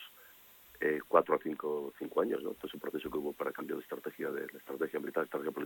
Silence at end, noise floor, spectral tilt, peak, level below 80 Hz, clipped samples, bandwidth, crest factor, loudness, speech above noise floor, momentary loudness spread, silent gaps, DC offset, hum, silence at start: 0 s; -59 dBFS; -5.5 dB/octave; -12 dBFS; -74 dBFS; under 0.1%; 17.5 kHz; 24 dB; -36 LUFS; 23 dB; 14 LU; none; under 0.1%; none; 0 s